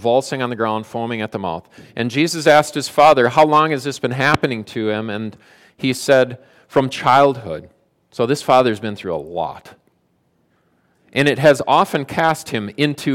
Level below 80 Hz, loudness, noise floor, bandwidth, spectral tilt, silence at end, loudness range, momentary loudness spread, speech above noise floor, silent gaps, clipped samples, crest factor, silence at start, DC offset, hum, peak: -54 dBFS; -17 LUFS; -63 dBFS; 16.5 kHz; -5 dB/octave; 0 s; 6 LU; 13 LU; 46 dB; none; under 0.1%; 16 dB; 0 s; under 0.1%; none; -2 dBFS